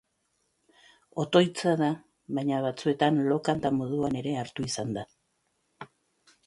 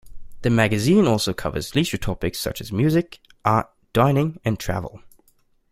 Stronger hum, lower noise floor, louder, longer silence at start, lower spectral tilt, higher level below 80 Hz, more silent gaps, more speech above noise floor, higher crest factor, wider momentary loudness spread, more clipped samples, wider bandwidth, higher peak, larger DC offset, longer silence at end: neither; first, -75 dBFS vs -61 dBFS; second, -28 LUFS vs -22 LUFS; first, 1.15 s vs 0.05 s; about the same, -6 dB/octave vs -6 dB/octave; second, -64 dBFS vs -42 dBFS; neither; first, 48 dB vs 40 dB; about the same, 22 dB vs 20 dB; first, 18 LU vs 10 LU; neither; second, 11.5 kHz vs 16 kHz; second, -8 dBFS vs -2 dBFS; neither; second, 0.6 s vs 0.75 s